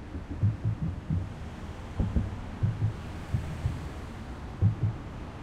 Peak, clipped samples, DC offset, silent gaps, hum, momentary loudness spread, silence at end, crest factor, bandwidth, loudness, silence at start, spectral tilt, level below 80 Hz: -14 dBFS; under 0.1%; under 0.1%; none; none; 12 LU; 0 s; 18 dB; 9.6 kHz; -33 LUFS; 0 s; -8 dB/octave; -40 dBFS